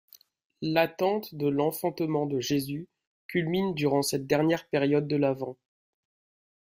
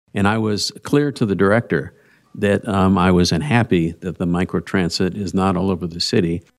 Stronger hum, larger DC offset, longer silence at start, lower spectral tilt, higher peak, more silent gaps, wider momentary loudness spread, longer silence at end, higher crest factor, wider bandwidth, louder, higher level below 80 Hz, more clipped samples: neither; neither; first, 0.6 s vs 0.15 s; about the same, -5.5 dB/octave vs -6 dB/octave; second, -10 dBFS vs -2 dBFS; first, 3.07-3.29 s vs none; about the same, 7 LU vs 7 LU; first, 1.1 s vs 0.2 s; about the same, 20 dB vs 16 dB; first, 16 kHz vs 13 kHz; second, -28 LUFS vs -19 LUFS; second, -66 dBFS vs -46 dBFS; neither